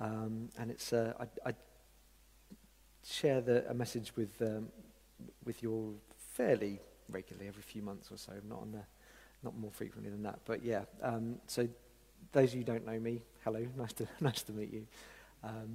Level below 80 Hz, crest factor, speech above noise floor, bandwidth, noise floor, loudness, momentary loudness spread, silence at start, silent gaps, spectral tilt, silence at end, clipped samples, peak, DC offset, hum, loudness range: -66 dBFS; 24 dB; 26 dB; 16 kHz; -65 dBFS; -40 LUFS; 17 LU; 0 s; none; -6 dB/octave; 0 s; under 0.1%; -16 dBFS; under 0.1%; none; 7 LU